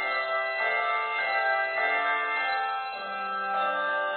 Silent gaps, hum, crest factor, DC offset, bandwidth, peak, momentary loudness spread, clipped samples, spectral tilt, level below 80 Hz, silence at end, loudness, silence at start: none; none; 14 dB; under 0.1%; 4.7 kHz; -14 dBFS; 6 LU; under 0.1%; -5 dB/octave; -74 dBFS; 0 s; -27 LUFS; 0 s